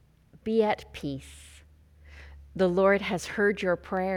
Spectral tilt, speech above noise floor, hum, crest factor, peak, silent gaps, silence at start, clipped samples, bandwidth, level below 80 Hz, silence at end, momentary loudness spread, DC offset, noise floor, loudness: -6 dB/octave; 28 dB; none; 18 dB; -12 dBFS; none; 0.45 s; under 0.1%; 15 kHz; -52 dBFS; 0 s; 16 LU; under 0.1%; -55 dBFS; -27 LUFS